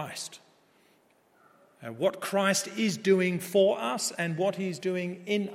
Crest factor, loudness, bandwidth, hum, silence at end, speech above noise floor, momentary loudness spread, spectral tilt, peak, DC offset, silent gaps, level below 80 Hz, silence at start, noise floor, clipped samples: 18 dB; -28 LUFS; 16.5 kHz; none; 0 s; 37 dB; 12 LU; -4 dB/octave; -10 dBFS; under 0.1%; none; -80 dBFS; 0 s; -65 dBFS; under 0.1%